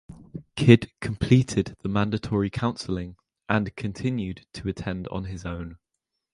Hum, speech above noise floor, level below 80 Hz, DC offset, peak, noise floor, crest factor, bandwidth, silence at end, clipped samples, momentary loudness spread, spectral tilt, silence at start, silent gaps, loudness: none; 58 dB; -46 dBFS; under 0.1%; 0 dBFS; -82 dBFS; 24 dB; 11 kHz; 0.6 s; under 0.1%; 17 LU; -7 dB/octave; 0.1 s; none; -25 LUFS